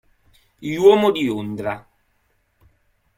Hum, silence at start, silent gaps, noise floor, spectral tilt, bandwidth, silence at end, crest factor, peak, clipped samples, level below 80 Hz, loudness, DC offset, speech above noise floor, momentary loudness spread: none; 0.6 s; none; -65 dBFS; -6 dB/octave; 15.5 kHz; 1.4 s; 20 dB; -2 dBFS; under 0.1%; -58 dBFS; -18 LUFS; under 0.1%; 48 dB; 18 LU